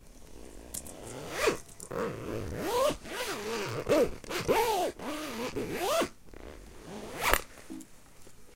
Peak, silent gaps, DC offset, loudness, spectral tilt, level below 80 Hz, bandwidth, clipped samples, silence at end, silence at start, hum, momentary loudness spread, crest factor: -4 dBFS; none; under 0.1%; -32 LUFS; -3.5 dB/octave; -48 dBFS; 17 kHz; under 0.1%; 0 s; 0 s; none; 20 LU; 30 dB